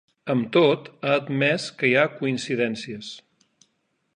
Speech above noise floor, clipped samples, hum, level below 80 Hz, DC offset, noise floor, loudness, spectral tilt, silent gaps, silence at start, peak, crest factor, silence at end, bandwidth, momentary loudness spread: 49 dB; under 0.1%; none; -70 dBFS; under 0.1%; -72 dBFS; -23 LUFS; -5.5 dB/octave; none; 0.25 s; -6 dBFS; 18 dB; 0.95 s; 10.5 kHz; 15 LU